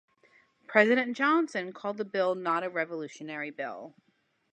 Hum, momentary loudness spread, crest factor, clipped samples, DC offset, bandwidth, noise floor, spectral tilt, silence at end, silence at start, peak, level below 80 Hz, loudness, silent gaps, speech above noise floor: none; 15 LU; 24 dB; under 0.1%; under 0.1%; 9.4 kHz; -64 dBFS; -5 dB/octave; 0.65 s; 0.7 s; -6 dBFS; -86 dBFS; -29 LUFS; none; 35 dB